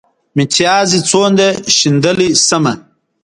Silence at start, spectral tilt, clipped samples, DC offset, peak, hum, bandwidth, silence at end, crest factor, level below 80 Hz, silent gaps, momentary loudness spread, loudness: 0.35 s; -3.5 dB/octave; under 0.1%; under 0.1%; 0 dBFS; none; 11.5 kHz; 0.45 s; 12 dB; -50 dBFS; none; 8 LU; -11 LUFS